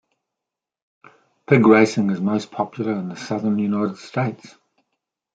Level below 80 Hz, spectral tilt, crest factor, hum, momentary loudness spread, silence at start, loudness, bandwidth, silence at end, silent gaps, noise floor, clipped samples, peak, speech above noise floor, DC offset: -66 dBFS; -7 dB/octave; 20 dB; none; 13 LU; 1.5 s; -20 LUFS; 9 kHz; 0.85 s; none; -86 dBFS; under 0.1%; -2 dBFS; 66 dB; under 0.1%